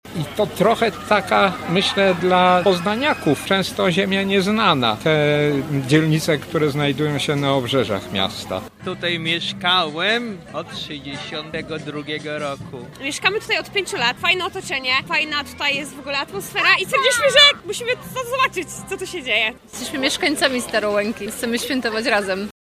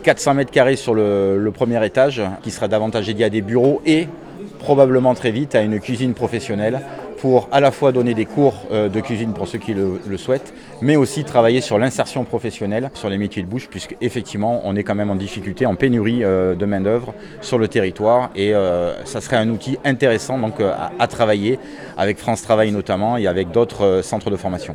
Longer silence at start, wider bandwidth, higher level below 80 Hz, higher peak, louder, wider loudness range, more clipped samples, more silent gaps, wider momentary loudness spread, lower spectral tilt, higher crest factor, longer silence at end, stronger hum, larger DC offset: about the same, 0.05 s vs 0 s; first, 15.5 kHz vs 13.5 kHz; about the same, -52 dBFS vs -50 dBFS; about the same, 0 dBFS vs 0 dBFS; about the same, -19 LUFS vs -18 LUFS; first, 6 LU vs 3 LU; neither; neither; first, 12 LU vs 9 LU; second, -4 dB/octave vs -6 dB/octave; about the same, 20 dB vs 18 dB; first, 0.25 s vs 0 s; neither; neither